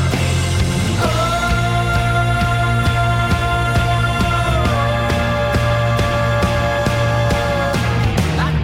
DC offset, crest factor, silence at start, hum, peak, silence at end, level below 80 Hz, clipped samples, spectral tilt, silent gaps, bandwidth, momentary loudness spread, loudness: under 0.1%; 10 dB; 0 s; none; -6 dBFS; 0 s; -26 dBFS; under 0.1%; -5.5 dB/octave; none; 16 kHz; 1 LU; -17 LUFS